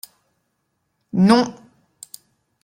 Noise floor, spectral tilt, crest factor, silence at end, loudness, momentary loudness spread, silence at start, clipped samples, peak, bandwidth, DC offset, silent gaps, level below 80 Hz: -72 dBFS; -6 dB/octave; 20 dB; 1.1 s; -18 LUFS; 25 LU; 1.15 s; under 0.1%; -4 dBFS; 16 kHz; under 0.1%; none; -60 dBFS